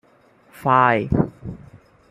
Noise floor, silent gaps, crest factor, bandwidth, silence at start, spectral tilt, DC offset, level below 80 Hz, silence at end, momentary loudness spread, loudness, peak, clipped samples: -55 dBFS; none; 20 dB; 15 kHz; 0.6 s; -8 dB/octave; under 0.1%; -44 dBFS; 0.55 s; 20 LU; -19 LUFS; -2 dBFS; under 0.1%